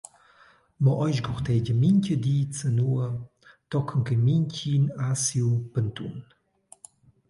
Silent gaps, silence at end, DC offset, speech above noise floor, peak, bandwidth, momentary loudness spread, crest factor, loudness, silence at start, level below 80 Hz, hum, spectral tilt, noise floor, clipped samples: none; 1.05 s; under 0.1%; 34 dB; -10 dBFS; 11.5 kHz; 9 LU; 14 dB; -25 LUFS; 0.8 s; -54 dBFS; none; -6.5 dB/octave; -58 dBFS; under 0.1%